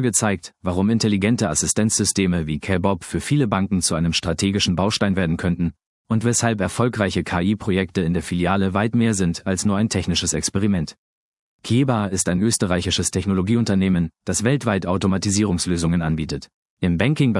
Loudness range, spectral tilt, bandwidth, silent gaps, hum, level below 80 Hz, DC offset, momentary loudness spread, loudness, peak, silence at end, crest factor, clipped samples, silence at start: 2 LU; -4.5 dB/octave; 12 kHz; 5.86-6.05 s, 10.98-11.59 s, 16.54-16.77 s; none; -46 dBFS; under 0.1%; 5 LU; -20 LUFS; -2 dBFS; 0 s; 18 dB; under 0.1%; 0 s